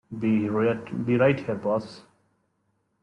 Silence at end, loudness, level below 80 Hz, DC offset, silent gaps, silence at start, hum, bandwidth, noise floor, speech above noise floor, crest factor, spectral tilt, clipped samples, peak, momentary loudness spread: 1 s; -25 LUFS; -64 dBFS; under 0.1%; none; 0.1 s; none; 9.6 kHz; -73 dBFS; 48 dB; 18 dB; -8.5 dB/octave; under 0.1%; -10 dBFS; 8 LU